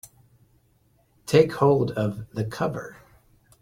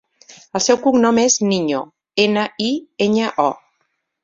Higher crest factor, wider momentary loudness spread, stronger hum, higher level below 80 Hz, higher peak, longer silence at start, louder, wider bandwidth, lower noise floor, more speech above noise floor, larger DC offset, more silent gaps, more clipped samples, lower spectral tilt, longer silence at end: about the same, 22 dB vs 18 dB; first, 17 LU vs 10 LU; neither; about the same, -56 dBFS vs -60 dBFS; about the same, -4 dBFS vs -2 dBFS; first, 1.25 s vs 0.3 s; second, -23 LUFS vs -17 LUFS; first, 16 kHz vs 7.8 kHz; second, -63 dBFS vs -69 dBFS; second, 41 dB vs 53 dB; neither; neither; neither; first, -7 dB/octave vs -3.5 dB/octave; about the same, 0.7 s vs 0.7 s